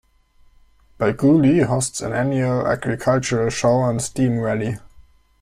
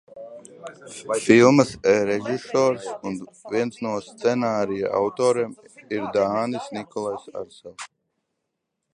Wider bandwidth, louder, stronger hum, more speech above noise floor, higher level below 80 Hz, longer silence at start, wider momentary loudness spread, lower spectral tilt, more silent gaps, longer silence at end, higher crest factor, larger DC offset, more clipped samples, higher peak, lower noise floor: first, 14.5 kHz vs 11.5 kHz; first, -19 LUFS vs -22 LUFS; neither; second, 36 dB vs 57 dB; first, -48 dBFS vs -62 dBFS; first, 1 s vs 0.15 s; second, 8 LU vs 22 LU; about the same, -6 dB/octave vs -5.5 dB/octave; neither; second, 0.4 s vs 1.1 s; second, 16 dB vs 22 dB; neither; neither; second, -4 dBFS vs 0 dBFS; second, -54 dBFS vs -79 dBFS